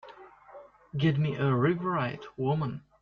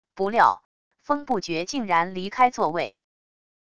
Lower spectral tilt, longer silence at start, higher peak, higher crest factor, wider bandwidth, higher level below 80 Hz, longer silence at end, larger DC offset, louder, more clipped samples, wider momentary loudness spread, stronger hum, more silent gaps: first, -9 dB/octave vs -4.5 dB/octave; about the same, 0.05 s vs 0.05 s; second, -14 dBFS vs -4 dBFS; about the same, 16 dB vs 20 dB; second, 6.4 kHz vs 11 kHz; about the same, -64 dBFS vs -62 dBFS; second, 0.2 s vs 0.65 s; second, under 0.1% vs 0.5%; second, -29 LUFS vs -24 LUFS; neither; about the same, 9 LU vs 10 LU; neither; second, none vs 0.65-0.91 s